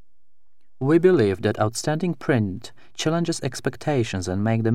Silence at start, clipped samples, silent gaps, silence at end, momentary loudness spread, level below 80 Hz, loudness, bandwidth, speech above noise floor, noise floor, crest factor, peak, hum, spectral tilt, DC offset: 0.8 s; under 0.1%; none; 0 s; 10 LU; -58 dBFS; -23 LUFS; 15 kHz; 52 dB; -74 dBFS; 18 dB; -6 dBFS; none; -6 dB/octave; 1%